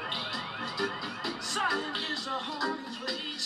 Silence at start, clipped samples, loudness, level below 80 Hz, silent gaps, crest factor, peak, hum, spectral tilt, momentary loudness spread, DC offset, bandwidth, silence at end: 0 s; under 0.1%; -32 LUFS; -70 dBFS; none; 16 dB; -18 dBFS; none; -2 dB/octave; 6 LU; under 0.1%; 15.5 kHz; 0 s